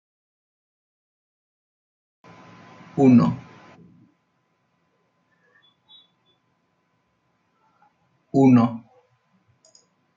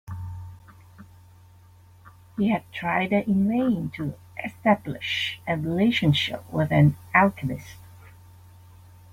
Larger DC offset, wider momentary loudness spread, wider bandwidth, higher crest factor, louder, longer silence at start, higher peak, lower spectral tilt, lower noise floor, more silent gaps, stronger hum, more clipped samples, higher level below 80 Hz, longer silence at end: neither; about the same, 19 LU vs 17 LU; second, 7.4 kHz vs 16 kHz; about the same, 20 dB vs 22 dB; first, -18 LUFS vs -24 LUFS; first, 2.95 s vs 0.05 s; second, -6 dBFS vs -2 dBFS; first, -9 dB/octave vs -7 dB/octave; first, -70 dBFS vs -52 dBFS; neither; neither; neither; second, -66 dBFS vs -56 dBFS; first, 1.4 s vs 1.05 s